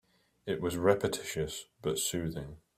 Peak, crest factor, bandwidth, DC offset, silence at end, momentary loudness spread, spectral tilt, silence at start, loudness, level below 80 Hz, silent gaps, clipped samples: -10 dBFS; 24 dB; 16 kHz; under 0.1%; 0.2 s; 11 LU; -4 dB/octave; 0.45 s; -33 LUFS; -58 dBFS; none; under 0.1%